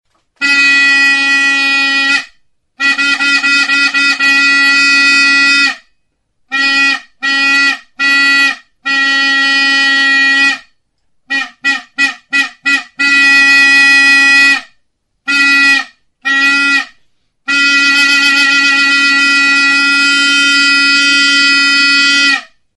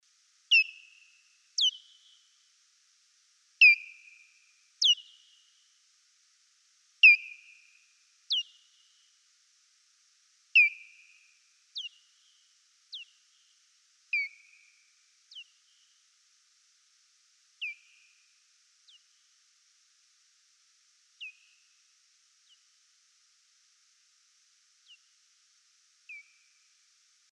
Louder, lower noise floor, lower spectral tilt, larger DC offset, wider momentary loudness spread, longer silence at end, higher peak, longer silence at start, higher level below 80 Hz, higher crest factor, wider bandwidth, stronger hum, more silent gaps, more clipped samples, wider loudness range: first, -7 LUFS vs -24 LUFS; second, -60 dBFS vs -67 dBFS; first, 1 dB/octave vs 10 dB/octave; neither; second, 9 LU vs 30 LU; second, 0.3 s vs 1.15 s; first, 0 dBFS vs -8 dBFS; about the same, 0.4 s vs 0.5 s; first, -62 dBFS vs under -90 dBFS; second, 10 dB vs 26 dB; about the same, 12 kHz vs 11.5 kHz; neither; neither; neither; second, 4 LU vs 21 LU